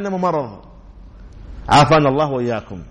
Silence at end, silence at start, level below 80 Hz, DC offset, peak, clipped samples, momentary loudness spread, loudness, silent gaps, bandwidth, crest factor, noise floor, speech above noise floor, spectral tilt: 0 s; 0 s; -38 dBFS; under 0.1%; -4 dBFS; under 0.1%; 16 LU; -16 LUFS; none; 11 kHz; 16 dB; -40 dBFS; 24 dB; -6 dB/octave